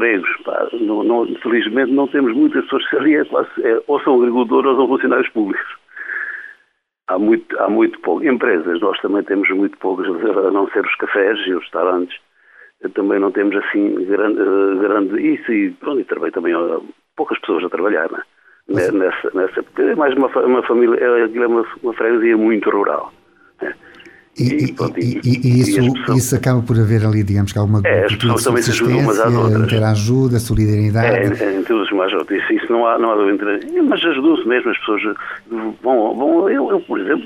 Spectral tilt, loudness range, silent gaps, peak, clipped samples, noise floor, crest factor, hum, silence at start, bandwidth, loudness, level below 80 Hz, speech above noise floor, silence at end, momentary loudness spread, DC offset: -6.5 dB/octave; 4 LU; none; -2 dBFS; under 0.1%; -61 dBFS; 14 dB; none; 0 s; 16 kHz; -16 LUFS; -44 dBFS; 46 dB; 0 s; 8 LU; under 0.1%